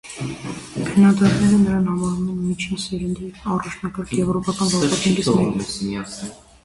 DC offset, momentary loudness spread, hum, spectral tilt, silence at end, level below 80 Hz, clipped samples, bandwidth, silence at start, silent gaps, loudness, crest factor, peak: under 0.1%; 14 LU; none; -5.5 dB/octave; 0.3 s; -44 dBFS; under 0.1%; 11.5 kHz; 0.05 s; none; -20 LUFS; 16 dB; -4 dBFS